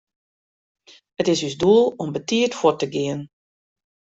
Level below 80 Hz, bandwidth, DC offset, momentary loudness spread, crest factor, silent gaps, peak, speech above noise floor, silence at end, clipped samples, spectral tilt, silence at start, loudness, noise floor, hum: -62 dBFS; 8 kHz; under 0.1%; 11 LU; 20 dB; none; -4 dBFS; over 70 dB; 0.9 s; under 0.1%; -5 dB/octave; 1.2 s; -20 LUFS; under -90 dBFS; none